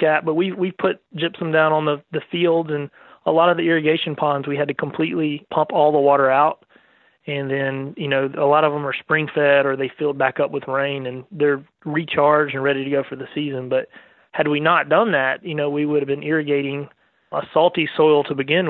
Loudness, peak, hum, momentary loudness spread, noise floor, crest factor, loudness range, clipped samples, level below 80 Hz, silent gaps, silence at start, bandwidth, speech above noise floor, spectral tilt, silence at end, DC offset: -20 LUFS; -4 dBFS; none; 11 LU; -56 dBFS; 16 dB; 2 LU; under 0.1%; -68 dBFS; none; 0 s; 4.2 kHz; 36 dB; -10.5 dB/octave; 0 s; under 0.1%